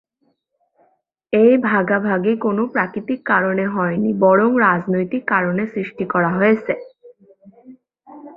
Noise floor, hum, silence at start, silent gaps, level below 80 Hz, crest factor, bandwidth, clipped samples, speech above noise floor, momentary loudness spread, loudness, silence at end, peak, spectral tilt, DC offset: -67 dBFS; none; 1.3 s; none; -62 dBFS; 18 dB; 5 kHz; under 0.1%; 50 dB; 9 LU; -17 LUFS; 0.05 s; -2 dBFS; -10.5 dB/octave; under 0.1%